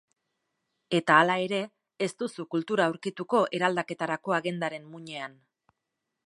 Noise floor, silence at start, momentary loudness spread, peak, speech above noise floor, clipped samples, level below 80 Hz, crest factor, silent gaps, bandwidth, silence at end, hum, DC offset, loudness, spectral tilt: -84 dBFS; 0.9 s; 17 LU; -4 dBFS; 56 dB; under 0.1%; -80 dBFS; 24 dB; none; 11.5 kHz; 1 s; none; under 0.1%; -27 LUFS; -5 dB/octave